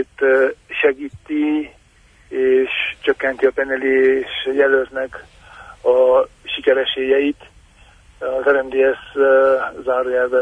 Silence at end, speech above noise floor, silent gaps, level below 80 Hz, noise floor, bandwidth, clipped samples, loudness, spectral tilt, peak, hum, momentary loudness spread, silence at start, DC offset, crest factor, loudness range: 0 s; 35 dB; none; -52 dBFS; -51 dBFS; 8.2 kHz; under 0.1%; -17 LUFS; -5 dB/octave; -2 dBFS; none; 10 LU; 0 s; under 0.1%; 14 dB; 2 LU